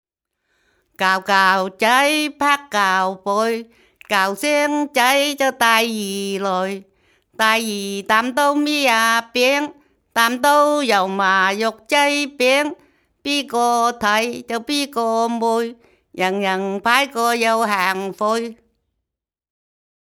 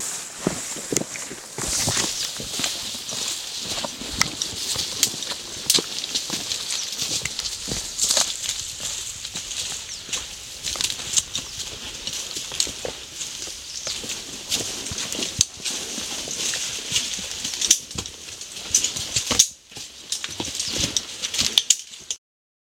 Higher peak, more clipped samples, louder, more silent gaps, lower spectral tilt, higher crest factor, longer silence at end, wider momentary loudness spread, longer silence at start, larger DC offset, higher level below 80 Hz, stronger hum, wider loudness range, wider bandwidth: about the same, 0 dBFS vs 0 dBFS; neither; first, -18 LUFS vs -24 LUFS; neither; first, -2.5 dB/octave vs -0.5 dB/octave; second, 18 dB vs 28 dB; first, 1.55 s vs 0.6 s; second, 8 LU vs 11 LU; first, 1 s vs 0 s; neither; second, -64 dBFS vs -50 dBFS; neither; about the same, 3 LU vs 4 LU; about the same, 18.5 kHz vs 17 kHz